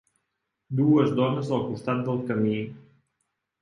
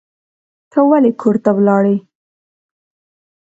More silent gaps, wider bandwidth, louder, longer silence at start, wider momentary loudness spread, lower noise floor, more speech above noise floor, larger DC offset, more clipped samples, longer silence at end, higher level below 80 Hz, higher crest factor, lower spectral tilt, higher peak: neither; first, 10.5 kHz vs 7.8 kHz; second, -25 LUFS vs -14 LUFS; about the same, 0.7 s vs 0.75 s; first, 10 LU vs 7 LU; second, -80 dBFS vs under -90 dBFS; second, 56 dB vs over 78 dB; neither; neither; second, 0.8 s vs 1.4 s; about the same, -66 dBFS vs -64 dBFS; about the same, 18 dB vs 16 dB; second, -8.5 dB/octave vs -10 dB/octave; second, -10 dBFS vs 0 dBFS